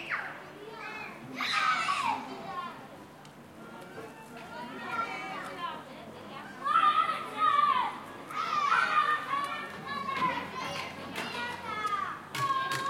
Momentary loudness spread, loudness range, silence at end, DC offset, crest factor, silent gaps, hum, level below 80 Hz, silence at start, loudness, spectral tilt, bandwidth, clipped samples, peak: 20 LU; 12 LU; 0 s; under 0.1%; 20 dB; none; none; -74 dBFS; 0 s; -31 LUFS; -3 dB/octave; 16.5 kHz; under 0.1%; -14 dBFS